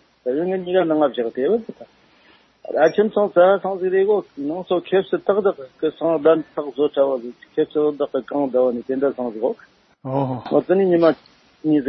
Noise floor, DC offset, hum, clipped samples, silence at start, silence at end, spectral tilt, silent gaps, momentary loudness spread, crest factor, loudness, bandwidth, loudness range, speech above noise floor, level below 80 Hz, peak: -54 dBFS; under 0.1%; none; under 0.1%; 0.25 s; 0 s; -8.5 dB/octave; none; 10 LU; 18 dB; -20 LUFS; 6 kHz; 3 LU; 35 dB; -66 dBFS; -2 dBFS